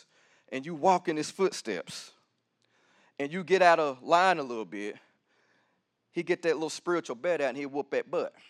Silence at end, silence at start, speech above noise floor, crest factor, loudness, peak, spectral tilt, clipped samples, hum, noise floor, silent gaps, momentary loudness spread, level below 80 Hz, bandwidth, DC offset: 0.2 s; 0.5 s; 47 dB; 22 dB; -29 LUFS; -8 dBFS; -4.5 dB/octave; under 0.1%; none; -76 dBFS; none; 16 LU; under -90 dBFS; 12.5 kHz; under 0.1%